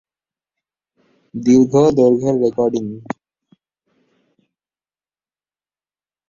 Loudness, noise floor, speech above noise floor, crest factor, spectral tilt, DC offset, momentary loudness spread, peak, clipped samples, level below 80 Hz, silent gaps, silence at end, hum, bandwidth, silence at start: -15 LUFS; under -90 dBFS; over 76 dB; 18 dB; -7.5 dB/octave; under 0.1%; 18 LU; -2 dBFS; under 0.1%; -56 dBFS; none; 3.25 s; none; 7.4 kHz; 1.35 s